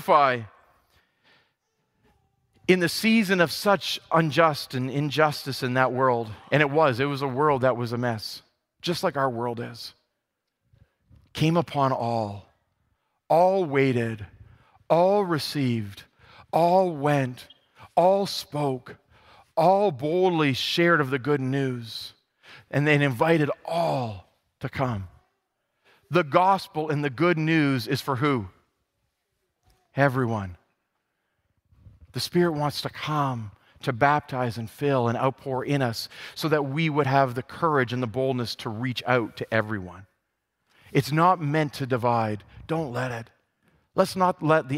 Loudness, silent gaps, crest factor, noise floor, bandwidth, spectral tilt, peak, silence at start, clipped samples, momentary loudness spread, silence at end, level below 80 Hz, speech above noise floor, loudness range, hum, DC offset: -24 LUFS; none; 22 dB; -81 dBFS; 16 kHz; -6 dB/octave; -4 dBFS; 0 s; under 0.1%; 13 LU; 0 s; -62 dBFS; 57 dB; 6 LU; none; under 0.1%